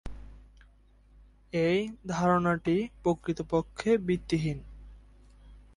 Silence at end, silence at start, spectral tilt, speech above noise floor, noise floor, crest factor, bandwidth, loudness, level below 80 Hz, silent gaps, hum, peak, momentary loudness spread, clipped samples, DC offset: 0.15 s; 0.05 s; -7 dB/octave; 31 dB; -59 dBFS; 20 dB; 11.5 kHz; -29 LUFS; -50 dBFS; none; none; -12 dBFS; 9 LU; under 0.1%; under 0.1%